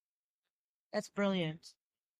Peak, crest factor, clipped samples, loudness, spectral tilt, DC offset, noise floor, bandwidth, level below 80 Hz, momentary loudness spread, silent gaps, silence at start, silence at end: -22 dBFS; 18 dB; under 0.1%; -37 LUFS; -6 dB/octave; under 0.1%; under -90 dBFS; 13.5 kHz; -80 dBFS; 9 LU; none; 0.95 s; 0.5 s